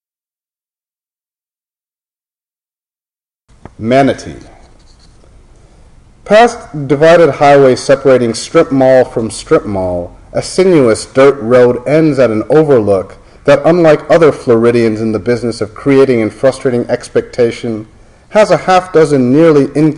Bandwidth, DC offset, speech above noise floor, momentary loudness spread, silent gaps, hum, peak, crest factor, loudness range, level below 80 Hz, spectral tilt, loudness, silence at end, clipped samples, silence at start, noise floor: 11.5 kHz; under 0.1%; over 81 dB; 10 LU; none; none; 0 dBFS; 10 dB; 10 LU; -40 dBFS; -6 dB/octave; -10 LUFS; 0 s; under 0.1%; 3.8 s; under -90 dBFS